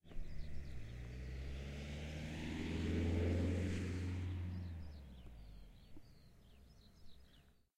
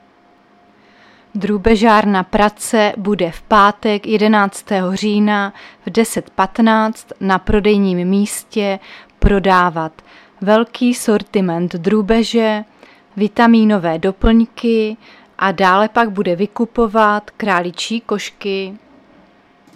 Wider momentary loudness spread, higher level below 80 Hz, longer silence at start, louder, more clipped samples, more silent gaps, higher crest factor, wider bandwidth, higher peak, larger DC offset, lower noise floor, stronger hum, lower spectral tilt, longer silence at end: first, 25 LU vs 10 LU; second, -52 dBFS vs -32 dBFS; second, 0.05 s vs 1.35 s; second, -44 LUFS vs -15 LUFS; neither; neither; about the same, 16 dB vs 16 dB; second, 11 kHz vs 14.5 kHz; second, -28 dBFS vs 0 dBFS; neither; first, -68 dBFS vs -50 dBFS; neither; first, -7 dB/octave vs -5.5 dB/octave; second, 0.25 s vs 1 s